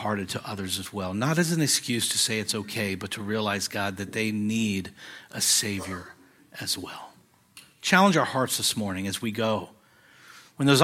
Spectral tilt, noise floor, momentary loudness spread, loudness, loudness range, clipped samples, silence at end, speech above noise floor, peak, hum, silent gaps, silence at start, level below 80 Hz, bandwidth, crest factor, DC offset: -3.5 dB/octave; -56 dBFS; 14 LU; -26 LUFS; 3 LU; under 0.1%; 0 s; 30 dB; -2 dBFS; none; none; 0 s; -66 dBFS; 16.5 kHz; 24 dB; under 0.1%